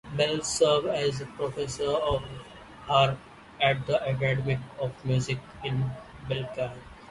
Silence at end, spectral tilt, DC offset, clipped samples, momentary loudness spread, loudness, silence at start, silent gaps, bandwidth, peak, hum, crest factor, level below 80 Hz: 0 s; -4.5 dB/octave; under 0.1%; under 0.1%; 13 LU; -28 LUFS; 0.05 s; none; 11.5 kHz; -10 dBFS; none; 20 dB; -50 dBFS